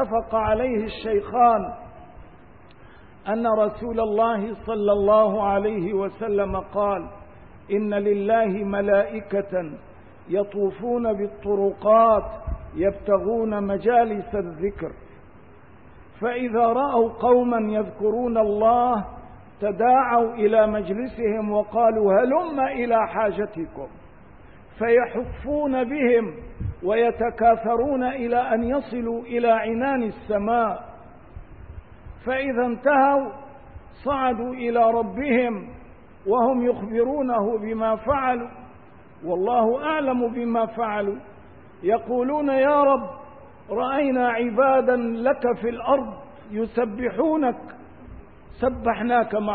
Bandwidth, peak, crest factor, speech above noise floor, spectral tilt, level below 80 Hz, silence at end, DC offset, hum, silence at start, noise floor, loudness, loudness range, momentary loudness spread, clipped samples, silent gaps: 4.6 kHz; -6 dBFS; 16 dB; 27 dB; -11 dB/octave; -46 dBFS; 0 s; 0.3%; none; 0 s; -49 dBFS; -22 LUFS; 4 LU; 11 LU; under 0.1%; none